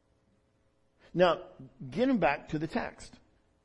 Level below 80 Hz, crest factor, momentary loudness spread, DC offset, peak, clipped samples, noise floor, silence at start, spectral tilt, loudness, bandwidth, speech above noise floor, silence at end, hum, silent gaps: -58 dBFS; 20 dB; 20 LU; under 0.1%; -12 dBFS; under 0.1%; -70 dBFS; 1.15 s; -6.5 dB/octave; -30 LUFS; 11 kHz; 40 dB; 0.55 s; none; none